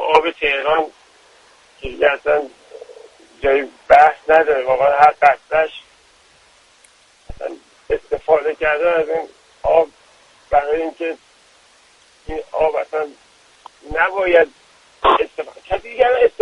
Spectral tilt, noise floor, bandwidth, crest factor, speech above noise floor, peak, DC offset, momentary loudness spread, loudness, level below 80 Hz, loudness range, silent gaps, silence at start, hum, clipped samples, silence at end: -4.5 dB/octave; -52 dBFS; 11 kHz; 18 dB; 36 dB; 0 dBFS; under 0.1%; 18 LU; -17 LUFS; -44 dBFS; 8 LU; none; 0 s; none; under 0.1%; 0.15 s